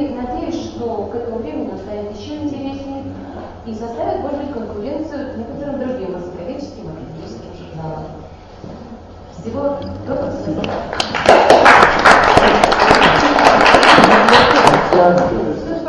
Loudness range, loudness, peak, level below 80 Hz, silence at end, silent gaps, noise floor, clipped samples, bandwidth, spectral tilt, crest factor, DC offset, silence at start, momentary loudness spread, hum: 19 LU; -12 LUFS; 0 dBFS; -36 dBFS; 0 s; none; -35 dBFS; 0.2%; 11 kHz; -4.5 dB/octave; 14 dB; under 0.1%; 0 s; 23 LU; none